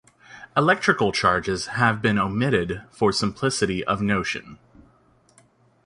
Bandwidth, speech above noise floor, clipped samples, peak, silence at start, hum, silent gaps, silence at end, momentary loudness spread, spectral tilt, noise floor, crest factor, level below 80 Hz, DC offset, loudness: 11.5 kHz; 36 dB; under 0.1%; -2 dBFS; 0.3 s; none; none; 1.3 s; 7 LU; -5 dB/octave; -59 dBFS; 20 dB; -50 dBFS; under 0.1%; -22 LUFS